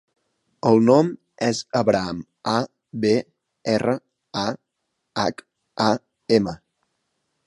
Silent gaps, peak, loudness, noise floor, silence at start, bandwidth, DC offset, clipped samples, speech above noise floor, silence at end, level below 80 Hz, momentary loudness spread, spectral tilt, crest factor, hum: none; -2 dBFS; -22 LUFS; -77 dBFS; 0.65 s; 11.5 kHz; under 0.1%; under 0.1%; 57 dB; 0.9 s; -58 dBFS; 14 LU; -5.5 dB/octave; 20 dB; none